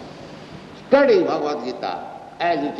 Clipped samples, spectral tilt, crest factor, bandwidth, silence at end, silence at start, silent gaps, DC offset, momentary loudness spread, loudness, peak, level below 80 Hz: under 0.1%; -6 dB/octave; 18 dB; 7.8 kHz; 0 s; 0 s; none; under 0.1%; 23 LU; -20 LUFS; -2 dBFS; -60 dBFS